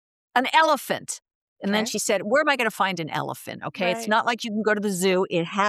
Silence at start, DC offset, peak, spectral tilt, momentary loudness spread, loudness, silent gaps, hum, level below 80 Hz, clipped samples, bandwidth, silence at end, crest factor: 0.35 s; under 0.1%; -8 dBFS; -3.5 dB/octave; 13 LU; -23 LUFS; 1.35-1.56 s; none; -76 dBFS; under 0.1%; 15 kHz; 0 s; 16 dB